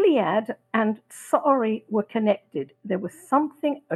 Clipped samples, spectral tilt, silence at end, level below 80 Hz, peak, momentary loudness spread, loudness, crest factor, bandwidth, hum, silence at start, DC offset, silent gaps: under 0.1%; -6 dB/octave; 0 s; -76 dBFS; -6 dBFS; 9 LU; -25 LUFS; 18 dB; 12.5 kHz; none; 0 s; under 0.1%; none